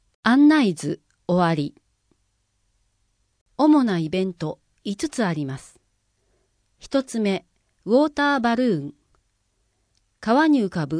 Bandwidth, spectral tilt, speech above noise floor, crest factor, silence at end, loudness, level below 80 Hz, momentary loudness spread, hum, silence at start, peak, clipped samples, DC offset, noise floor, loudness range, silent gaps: 10.5 kHz; -6 dB/octave; 50 dB; 18 dB; 0 s; -21 LUFS; -60 dBFS; 16 LU; none; 0.25 s; -6 dBFS; under 0.1%; under 0.1%; -70 dBFS; 6 LU; 3.41-3.46 s